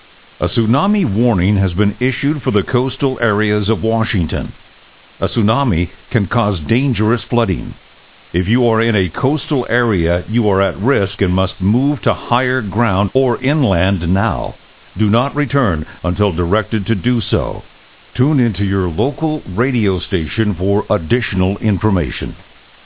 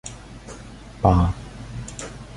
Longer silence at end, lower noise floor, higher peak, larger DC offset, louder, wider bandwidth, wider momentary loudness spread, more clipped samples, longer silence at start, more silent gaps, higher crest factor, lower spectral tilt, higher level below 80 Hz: first, 0.45 s vs 0 s; first, -45 dBFS vs -40 dBFS; about the same, 0 dBFS vs -2 dBFS; first, 0.9% vs under 0.1%; first, -16 LUFS vs -23 LUFS; second, 4 kHz vs 11.5 kHz; second, 6 LU vs 22 LU; neither; first, 0.4 s vs 0.05 s; neither; second, 16 dB vs 22 dB; first, -11 dB/octave vs -7 dB/octave; about the same, -30 dBFS vs -32 dBFS